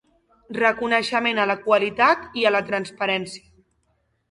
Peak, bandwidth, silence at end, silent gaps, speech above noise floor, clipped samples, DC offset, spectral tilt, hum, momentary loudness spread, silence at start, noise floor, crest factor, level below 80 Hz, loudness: -4 dBFS; 11.5 kHz; 0.95 s; none; 47 dB; under 0.1%; under 0.1%; -4 dB/octave; none; 9 LU; 0.5 s; -69 dBFS; 20 dB; -62 dBFS; -21 LUFS